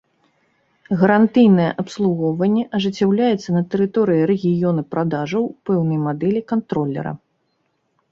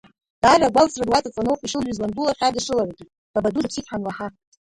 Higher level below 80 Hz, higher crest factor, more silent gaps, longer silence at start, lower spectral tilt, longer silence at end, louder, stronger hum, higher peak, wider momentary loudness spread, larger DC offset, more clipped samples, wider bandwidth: second, -60 dBFS vs -48 dBFS; about the same, 18 dB vs 20 dB; second, none vs 3.18-3.34 s; first, 0.9 s vs 0.45 s; first, -8 dB/octave vs -4 dB/octave; first, 0.95 s vs 0.4 s; first, -18 LUFS vs -21 LUFS; neither; about the same, -2 dBFS vs -2 dBFS; second, 9 LU vs 13 LU; neither; neither; second, 7.4 kHz vs 11.5 kHz